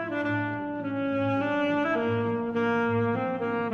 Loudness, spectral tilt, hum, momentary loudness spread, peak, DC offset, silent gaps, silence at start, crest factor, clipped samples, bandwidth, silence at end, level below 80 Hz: -27 LUFS; -8 dB/octave; none; 5 LU; -16 dBFS; under 0.1%; none; 0 s; 12 dB; under 0.1%; 7 kHz; 0 s; -64 dBFS